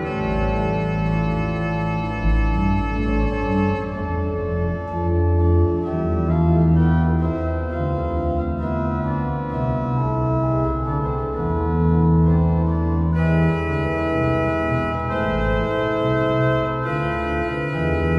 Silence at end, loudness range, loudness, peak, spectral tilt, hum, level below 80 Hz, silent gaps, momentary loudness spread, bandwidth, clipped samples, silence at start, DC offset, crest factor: 0 s; 3 LU; -21 LUFS; -6 dBFS; -9.5 dB/octave; none; -28 dBFS; none; 6 LU; 6.2 kHz; under 0.1%; 0 s; under 0.1%; 14 dB